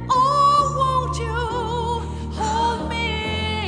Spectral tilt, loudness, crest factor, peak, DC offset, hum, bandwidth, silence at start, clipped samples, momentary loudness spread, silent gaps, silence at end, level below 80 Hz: -5 dB/octave; -21 LUFS; 14 dB; -6 dBFS; 0.1%; none; 10 kHz; 0 s; under 0.1%; 10 LU; none; 0 s; -34 dBFS